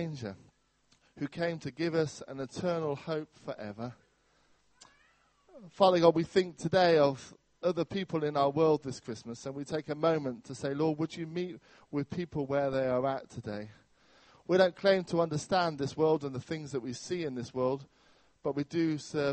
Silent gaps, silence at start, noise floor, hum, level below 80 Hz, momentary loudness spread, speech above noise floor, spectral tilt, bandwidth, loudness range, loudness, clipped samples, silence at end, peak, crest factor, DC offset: none; 0 s; -70 dBFS; none; -68 dBFS; 15 LU; 39 dB; -6 dB/octave; 8.4 kHz; 7 LU; -32 LUFS; under 0.1%; 0 s; -10 dBFS; 22 dB; under 0.1%